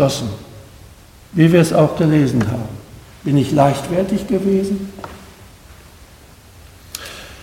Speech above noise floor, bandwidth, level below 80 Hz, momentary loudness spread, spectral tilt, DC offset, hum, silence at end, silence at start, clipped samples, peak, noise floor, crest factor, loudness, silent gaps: 28 dB; 16.5 kHz; -44 dBFS; 21 LU; -7 dB/octave; under 0.1%; none; 0 s; 0 s; under 0.1%; 0 dBFS; -43 dBFS; 18 dB; -16 LUFS; none